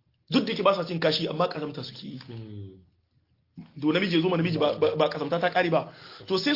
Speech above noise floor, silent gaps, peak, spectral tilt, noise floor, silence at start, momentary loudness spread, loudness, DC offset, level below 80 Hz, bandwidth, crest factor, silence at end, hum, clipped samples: 42 dB; none; -8 dBFS; -6.5 dB/octave; -69 dBFS; 0.3 s; 17 LU; -26 LUFS; under 0.1%; -68 dBFS; 5.8 kHz; 18 dB; 0 s; none; under 0.1%